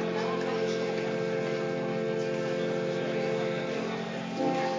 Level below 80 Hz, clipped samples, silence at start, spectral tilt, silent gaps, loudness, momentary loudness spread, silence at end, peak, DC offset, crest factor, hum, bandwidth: -68 dBFS; under 0.1%; 0 s; -6 dB/octave; none; -31 LUFS; 2 LU; 0 s; -18 dBFS; under 0.1%; 14 dB; none; 7.6 kHz